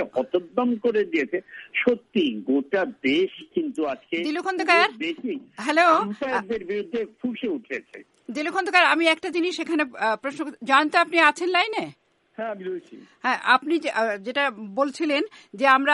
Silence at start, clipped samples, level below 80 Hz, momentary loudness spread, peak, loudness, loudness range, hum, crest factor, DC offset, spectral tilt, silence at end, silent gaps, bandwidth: 0 s; under 0.1%; -70 dBFS; 13 LU; -4 dBFS; -23 LUFS; 3 LU; none; 20 dB; under 0.1%; -4 dB/octave; 0 s; none; 11.5 kHz